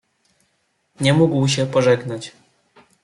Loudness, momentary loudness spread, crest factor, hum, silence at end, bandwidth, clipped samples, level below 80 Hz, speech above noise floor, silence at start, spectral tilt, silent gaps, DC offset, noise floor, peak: -18 LUFS; 15 LU; 16 dB; none; 0.75 s; 11.5 kHz; under 0.1%; -60 dBFS; 50 dB; 1 s; -5.5 dB/octave; none; under 0.1%; -68 dBFS; -4 dBFS